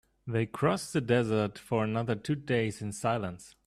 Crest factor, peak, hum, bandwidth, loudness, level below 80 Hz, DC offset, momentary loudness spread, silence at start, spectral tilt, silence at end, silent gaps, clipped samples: 18 dB; -12 dBFS; none; 14 kHz; -31 LUFS; -62 dBFS; under 0.1%; 6 LU; 0.25 s; -6 dB/octave; 0.15 s; none; under 0.1%